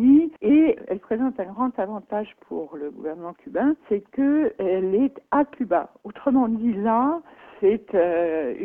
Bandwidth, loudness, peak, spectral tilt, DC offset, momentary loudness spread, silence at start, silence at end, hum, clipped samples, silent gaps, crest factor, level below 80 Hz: 3.5 kHz; -23 LUFS; -8 dBFS; -10 dB/octave; under 0.1%; 14 LU; 0 s; 0 s; none; under 0.1%; none; 14 dB; -60 dBFS